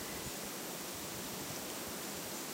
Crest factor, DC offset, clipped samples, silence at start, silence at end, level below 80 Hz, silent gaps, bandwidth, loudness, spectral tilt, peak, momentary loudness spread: 16 dB; under 0.1%; under 0.1%; 0 s; 0 s; -66 dBFS; none; 16 kHz; -41 LUFS; -2.5 dB/octave; -28 dBFS; 1 LU